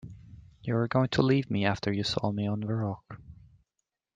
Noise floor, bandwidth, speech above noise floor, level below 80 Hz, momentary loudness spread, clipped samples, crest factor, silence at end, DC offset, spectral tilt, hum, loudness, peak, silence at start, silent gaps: -85 dBFS; 9.2 kHz; 56 dB; -58 dBFS; 17 LU; under 0.1%; 20 dB; 0.8 s; under 0.1%; -6.5 dB/octave; none; -29 LUFS; -10 dBFS; 0.05 s; none